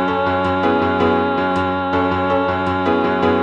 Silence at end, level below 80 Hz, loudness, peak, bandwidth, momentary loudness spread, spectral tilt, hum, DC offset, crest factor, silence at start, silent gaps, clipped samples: 0 s; -48 dBFS; -17 LUFS; -4 dBFS; 8.8 kHz; 2 LU; -7.5 dB/octave; none; under 0.1%; 12 dB; 0 s; none; under 0.1%